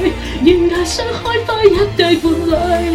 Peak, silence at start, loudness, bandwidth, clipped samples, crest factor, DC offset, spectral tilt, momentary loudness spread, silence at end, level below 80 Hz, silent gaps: 0 dBFS; 0 s; -14 LUFS; 15 kHz; 0.3%; 14 dB; under 0.1%; -5 dB/octave; 6 LU; 0 s; -28 dBFS; none